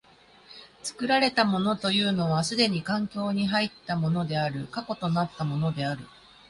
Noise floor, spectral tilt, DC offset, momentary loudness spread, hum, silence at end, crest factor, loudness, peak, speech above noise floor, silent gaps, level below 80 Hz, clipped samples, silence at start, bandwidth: -56 dBFS; -5 dB/octave; under 0.1%; 11 LU; none; 0.4 s; 18 dB; -26 LUFS; -8 dBFS; 29 dB; none; -60 dBFS; under 0.1%; 0.5 s; 11.5 kHz